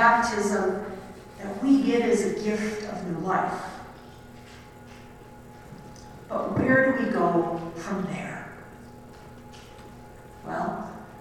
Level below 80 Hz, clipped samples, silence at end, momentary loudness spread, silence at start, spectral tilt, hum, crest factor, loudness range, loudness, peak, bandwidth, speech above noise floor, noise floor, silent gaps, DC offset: -54 dBFS; under 0.1%; 0 s; 25 LU; 0 s; -5.5 dB/octave; none; 22 dB; 10 LU; -26 LUFS; -6 dBFS; 13.5 kHz; 21 dB; -46 dBFS; none; under 0.1%